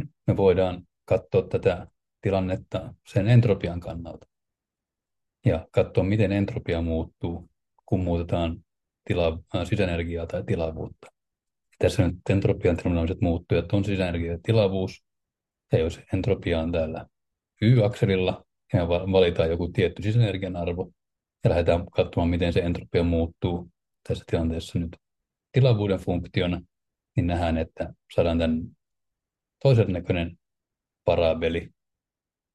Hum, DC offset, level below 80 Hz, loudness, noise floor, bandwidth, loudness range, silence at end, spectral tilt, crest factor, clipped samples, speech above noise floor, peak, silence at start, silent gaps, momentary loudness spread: none; under 0.1%; -46 dBFS; -25 LUFS; -90 dBFS; 11 kHz; 4 LU; 0.85 s; -8 dB/octave; 18 dB; under 0.1%; 66 dB; -6 dBFS; 0 s; none; 12 LU